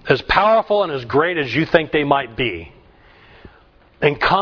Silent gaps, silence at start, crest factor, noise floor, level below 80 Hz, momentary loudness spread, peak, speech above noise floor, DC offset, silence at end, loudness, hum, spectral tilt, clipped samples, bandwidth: none; 0.05 s; 18 dB; -50 dBFS; -42 dBFS; 8 LU; 0 dBFS; 33 dB; under 0.1%; 0 s; -17 LUFS; none; -7 dB/octave; under 0.1%; 5.4 kHz